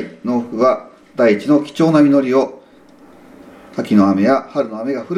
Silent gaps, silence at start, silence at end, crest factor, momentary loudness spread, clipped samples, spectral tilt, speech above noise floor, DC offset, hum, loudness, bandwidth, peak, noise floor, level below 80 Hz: none; 0 s; 0 s; 16 dB; 12 LU; under 0.1%; -7.5 dB/octave; 31 dB; under 0.1%; none; -15 LUFS; 10 kHz; 0 dBFS; -45 dBFS; -62 dBFS